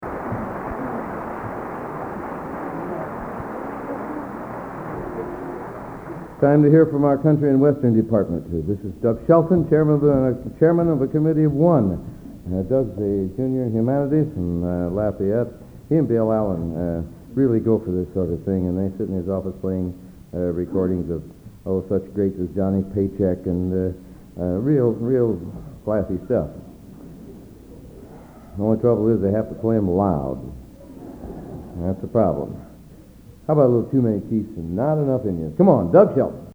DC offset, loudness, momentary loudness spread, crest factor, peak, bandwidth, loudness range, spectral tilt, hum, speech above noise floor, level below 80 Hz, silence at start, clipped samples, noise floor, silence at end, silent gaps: under 0.1%; -21 LUFS; 17 LU; 22 dB; 0 dBFS; over 20 kHz; 11 LU; -11 dB/octave; none; 25 dB; -44 dBFS; 0 s; under 0.1%; -44 dBFS; 0 s; none